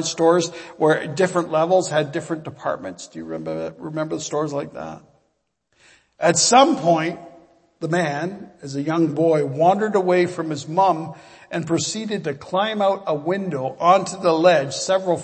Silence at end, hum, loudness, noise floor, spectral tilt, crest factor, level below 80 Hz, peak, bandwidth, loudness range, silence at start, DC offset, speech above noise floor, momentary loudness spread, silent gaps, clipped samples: 0 s; none; -20 LUFS; -70 dBFS; -4.5 dB/octave; 20 dB; -66 dBFS; -2 dBFS; 8.8 kHz; 8 LU; 0 s; under 0.1%; 50 dB; 14 LU; none; under 0.1%